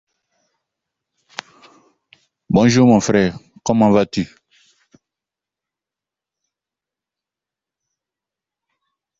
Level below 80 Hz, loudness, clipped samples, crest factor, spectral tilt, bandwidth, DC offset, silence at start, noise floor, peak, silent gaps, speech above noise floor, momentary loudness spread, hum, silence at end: -52 dBFS; -15 LUFS; under 0.1%; 18 dB; -6 dB/octave; 8 kHz; under 0.1%; 2.5 s; -88 dBFS; -2 dBFS; none; 74 dB; 22 LU; none; 4.95 s